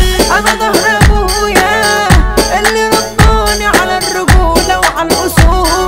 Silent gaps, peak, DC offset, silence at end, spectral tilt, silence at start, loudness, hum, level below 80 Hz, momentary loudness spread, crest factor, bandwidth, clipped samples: none; 0 dBFS; 0.6%; 0 s; -4 dB/octave; 0 s; -9 LUFS; none; -14 dBFS; 3 LU; 8 dB; 16.5 kHz; 1%